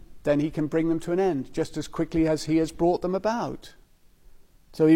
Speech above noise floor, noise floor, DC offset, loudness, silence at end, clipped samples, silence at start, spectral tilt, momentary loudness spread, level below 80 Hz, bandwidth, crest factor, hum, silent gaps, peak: 29 dB; -54 dBFS; under 0.1%; -26 LUFS; 0 s; under 0.1%; 0 s; -7 dB/octave; 7 LU; -48 dBFS; 14 kHz; 16 dB; none; none; -8 dBFS